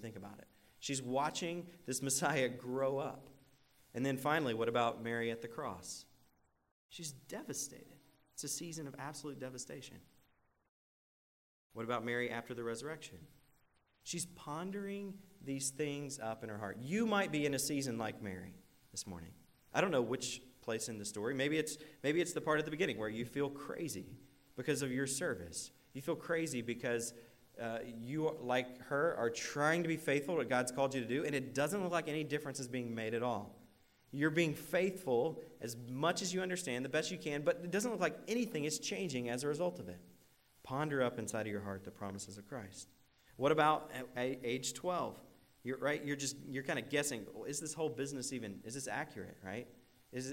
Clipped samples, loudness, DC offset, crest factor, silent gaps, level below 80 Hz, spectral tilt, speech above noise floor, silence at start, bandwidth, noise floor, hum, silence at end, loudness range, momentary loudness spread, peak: under 0.1%; -39 LUFS; under 0.1%; 22 dB; 6.71-6.89 s, 10.69-11.70 s; -74 dBFS; -4 dB/octave; 36 dB; 0 s; 16 kHz; -75 dBFS; none; 0 s; 8 LU; 13 LU; -18 dBFS